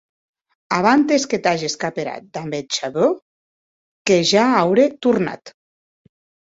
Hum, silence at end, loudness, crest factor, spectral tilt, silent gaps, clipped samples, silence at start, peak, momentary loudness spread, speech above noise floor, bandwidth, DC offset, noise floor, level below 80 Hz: none; 1 s; -18 LUFS; 18 dB; -4 dB/octave; 3.22-4.05 s; under 0.1%; 0.7 s; -2 dBFS; 13 LU; over 72 dB; 8 kHz; under 0.1%; under -90 dBFS; -62 dBFS